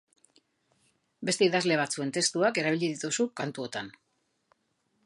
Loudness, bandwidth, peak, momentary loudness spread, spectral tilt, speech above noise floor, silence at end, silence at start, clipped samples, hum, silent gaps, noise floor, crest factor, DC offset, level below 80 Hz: -28 LUFS; 11.5 kHz; -10 dBFS; 12 LU; -3.5 dB/octave; 47 dB; 1.15 s; 1.2 s; under 0.1%; none; none; -75 dBFS; 20 dB; under 0.1%; -78 dBFS